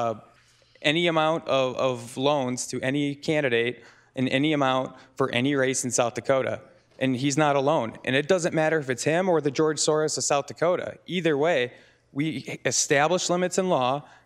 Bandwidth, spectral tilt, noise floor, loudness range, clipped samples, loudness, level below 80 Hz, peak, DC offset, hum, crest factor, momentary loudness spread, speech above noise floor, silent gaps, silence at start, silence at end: 14.5 kHz; -4 dB/octave; -59 dBFS; 2 LU; under 0.1%; -25 LUFS; -70 dBFS; -6 dBFS; under 0.1%; none; 20 dB; 8 LU; 34 dB; none; 0 s; 0.25 s